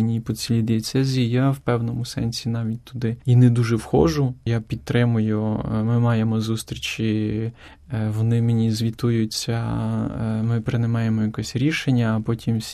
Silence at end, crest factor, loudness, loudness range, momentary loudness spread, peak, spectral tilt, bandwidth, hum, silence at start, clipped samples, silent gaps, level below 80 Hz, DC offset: 0 s; 16 dB; -22 LUFS; 3 LU; 7 LU; -4 dBFS; -6.5 dB/octave; 13.5 kHz; none; 0 s; under 0.1%; none; -46 dBFS; under 0.1%